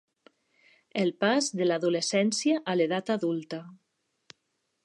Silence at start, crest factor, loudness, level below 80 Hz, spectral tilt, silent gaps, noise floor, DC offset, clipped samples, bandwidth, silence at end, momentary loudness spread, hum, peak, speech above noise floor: 0.95 s; 18 dB; -27 LUFS; -82 dBFS; -4 dB/octave; none; -78 dBFS; under 0.1%; under 0.1%; 11.5 kHz; 1.1 s; 9 LU; none; -10 dBFS; 51 dB